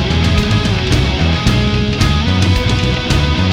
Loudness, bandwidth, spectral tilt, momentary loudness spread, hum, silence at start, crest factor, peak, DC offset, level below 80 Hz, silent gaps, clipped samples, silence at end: -14 LUFS; 15 kHz; -5.5 dB/octave; 1 LU; none; 0 s; 12 dB; 0 dBFS; under 0.1%; -20 dBFS; none; under 0.1%; 0 s